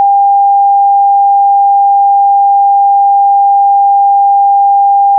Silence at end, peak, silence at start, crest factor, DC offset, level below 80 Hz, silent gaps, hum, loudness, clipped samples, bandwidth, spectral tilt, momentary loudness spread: 0 s; -4 dBFS; 0 s; 4 dB; under 0.1%; under -90 dBFS; none; none; -7 LUFS; under 0.1%; 1 kHz; 4.5 dB/octave; 0 LU